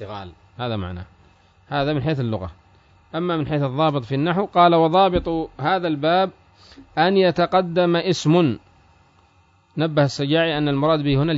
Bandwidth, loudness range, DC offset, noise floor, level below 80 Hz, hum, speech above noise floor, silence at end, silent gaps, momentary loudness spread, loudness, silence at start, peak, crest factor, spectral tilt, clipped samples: 7.8 kHz; 6 LU; under 0.1%; -57 dBFS; -46 dBFS; none; 38 dB; 0 s; none; 14 LU; -20 LUFS; 0 s; -4 dBFS; 18 dB; -6.5 dB/octave; under 0.1%